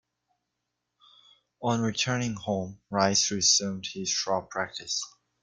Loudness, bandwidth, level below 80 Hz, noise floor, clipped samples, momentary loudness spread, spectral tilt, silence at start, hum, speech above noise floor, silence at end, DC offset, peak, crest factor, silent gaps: -27 LUFS; 11 kHz; -66 dBFS; -83 dBFS; under 0.1%; 12 LU; -2.5 dB/octave; 1.6 s; none; 54 dB; 0.35 s; under 0.1%; -8 dBFS; 22 dB; none